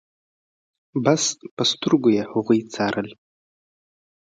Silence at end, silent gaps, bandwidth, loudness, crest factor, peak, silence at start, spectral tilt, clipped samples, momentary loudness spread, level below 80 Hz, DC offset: 1.2 s; 1.51-1.57 s; 9.4 kHz; -21 LUFS; 20 dB; -4 dBFS; 0.95 s; -4 dB/octave; under 0.1%; 9 LU; -64 dBFS; under 0.1%